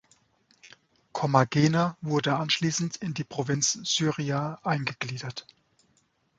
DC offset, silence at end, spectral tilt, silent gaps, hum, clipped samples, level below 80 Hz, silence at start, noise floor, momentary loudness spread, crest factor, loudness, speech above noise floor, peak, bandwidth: under 0.1%; 1 s; -4 dB/octave; none; none; under 0.1%; -66 dBFS; 0.65 s; -69 dBFS; 11 LU; 24 dB; -27 LUFS; 42 dB; -6 dBFS; 9.2 kHz